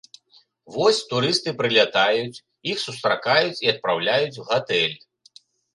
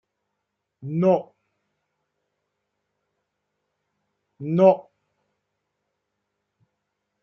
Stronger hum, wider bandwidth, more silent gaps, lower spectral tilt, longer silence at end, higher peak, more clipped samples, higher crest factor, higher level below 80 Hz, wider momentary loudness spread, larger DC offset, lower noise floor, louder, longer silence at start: neither; first, 11.5 kHz vs 6.6 kHz; neither; second, -3.5 dB/octave vs -10 dB/octave; second, 0.75 s vs 2.4 s; about the same, -2 dBFS vs -4 dBFS; neither; about the same, 22 dB vs 24 dB; first, -68 dBFS vs -76 dBFS; second, 9 LU vs 17 LU; neither; second, -58 dBFS vs -80 dBFS; about the same, -21 LUFS vs -21 LUFS; about the same, 0.7 s vs 0.8 s